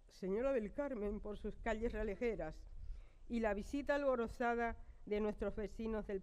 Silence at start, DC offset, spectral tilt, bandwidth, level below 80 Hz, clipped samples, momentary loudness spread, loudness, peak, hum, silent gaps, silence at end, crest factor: 0.05 s; under 0.1%; -7 dB/octave; 13 kHz; -52 dBFS; under 0.1%; 13 LU; -41 LUFS; -24 dBFS; none; none; 0 s; 16 dB